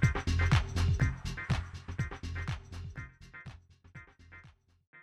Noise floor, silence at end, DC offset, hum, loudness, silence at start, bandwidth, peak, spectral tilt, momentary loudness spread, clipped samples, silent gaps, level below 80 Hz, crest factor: -59 dBFS; 0 s; under 0.1%; none; -34 LUFS; 0 s; 11.5 kHz; -14 dBFS; -6 dB/octave; 25 LU; under 0.1%; 4.87-4.93 s; -40 dBFS; 20 dB